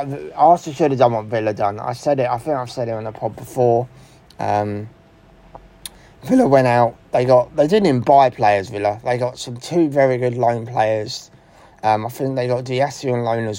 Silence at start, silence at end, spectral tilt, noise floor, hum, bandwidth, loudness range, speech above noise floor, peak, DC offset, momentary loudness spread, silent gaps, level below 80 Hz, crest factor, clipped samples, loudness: 0 s; 0 s; -6.5 dB/octave; -48 dBFS; none; 16.5 kHz; 7 LU; 30 dB; 0 dBFS; under 0.1%; 14 LU; none; -54 dBFS; 18 dB; under 0.1%; -18 LUFS